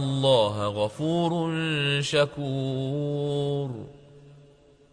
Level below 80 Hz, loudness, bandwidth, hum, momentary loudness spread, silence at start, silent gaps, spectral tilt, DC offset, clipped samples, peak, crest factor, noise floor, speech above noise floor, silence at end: -60 dBFS; -26 LUFS; 10.5 kHz; none; 8 LU; 0 s; none; -6 dB/octave; under 0.1%; under 0.1%; -8 dBFS; 18 dB; -56 dBFS; 30 dB; 0.55 s